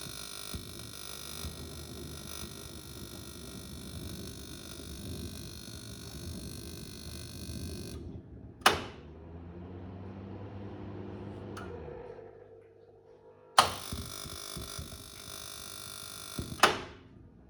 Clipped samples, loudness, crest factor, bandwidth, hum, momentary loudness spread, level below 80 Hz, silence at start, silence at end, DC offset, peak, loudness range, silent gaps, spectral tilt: under 0.1%; -37 LUFS; 34 dB; over 20 kHz; none; 20 LU; -52 dBFS; 0 s; 0 s; under 0.1%; -4 dBFS; 10 LU; none; -3 dB/octave